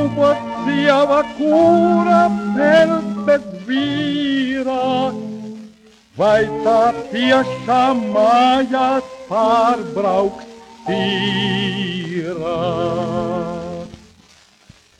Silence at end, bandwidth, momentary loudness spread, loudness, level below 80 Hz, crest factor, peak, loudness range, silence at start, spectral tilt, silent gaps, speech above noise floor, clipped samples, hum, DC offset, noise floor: 1.05 s; 10.5 kHz; 11 LU; -16 LUFS; -52 dBFS; 16 dB; -2 dBFS; 6 LU; 0 s; -6 dB/octave; none; 34 dB; under 0.1%; none; under 0.1%; -50 dBFS